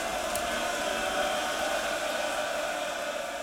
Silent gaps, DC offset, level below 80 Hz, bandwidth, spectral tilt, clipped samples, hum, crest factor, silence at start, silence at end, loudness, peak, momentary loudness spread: none; under 0.1%; -56 dBFS; 17 kHz; -1.5 dB/octave; under 0.1%; none; 18 dB; 0 s; 0 s; -30 LUFS; -12 dBFS; 3 LU